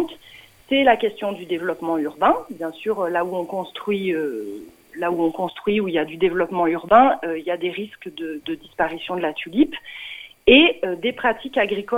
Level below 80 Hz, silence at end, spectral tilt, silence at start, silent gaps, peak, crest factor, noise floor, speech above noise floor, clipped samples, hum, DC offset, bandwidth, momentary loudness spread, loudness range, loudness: -52 dBFS; 0 s; -6 dB/octave; 0 s; none; 0 dBFS; 20 dB; -47 dBFS; 26 dB; under 0.1%; none; under 0.1%; 16.5 kHz; 17 LU; 5 LU; -21 LUFS